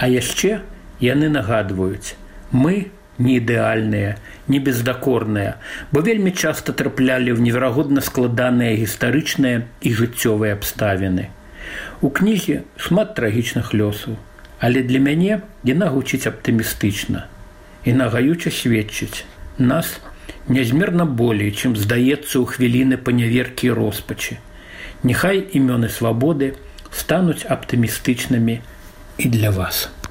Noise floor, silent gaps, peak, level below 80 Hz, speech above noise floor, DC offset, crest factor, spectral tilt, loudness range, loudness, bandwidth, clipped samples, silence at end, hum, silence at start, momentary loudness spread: -40 dBFS; none; -4 dBFS; -42 dBFS; 22 dB; under 0.1%; 16 dB; -5.5 dB/octave; 3 LU; -19 LUFS; 16.5 kHz; under 0.1%; 0 s; none; 0 s; 11 LU